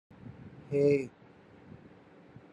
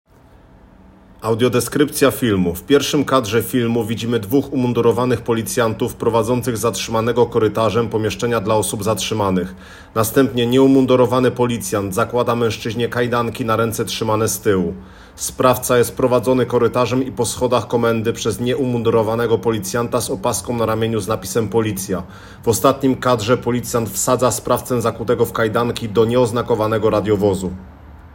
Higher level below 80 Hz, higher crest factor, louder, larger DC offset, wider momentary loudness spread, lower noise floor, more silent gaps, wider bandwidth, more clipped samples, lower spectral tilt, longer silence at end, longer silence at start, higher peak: second, -72 dBFS vs -46 dBFS; about the same, 20 dB vs 18 dB; second, -30 LUFS vs -18 LUFS; neither; first, 26 LU vs 5 LU; first, -56 dBFS vs -47 dBFS; neither; second, 8.6 kHz vs 17 kHz; neither; first, -8.5 dB/octave vs -5 dB/octave; first, 1.45 s vs 0 s; second, 0.25 s vs 1.2 s; second, -16 dBFS vs 0 dBFS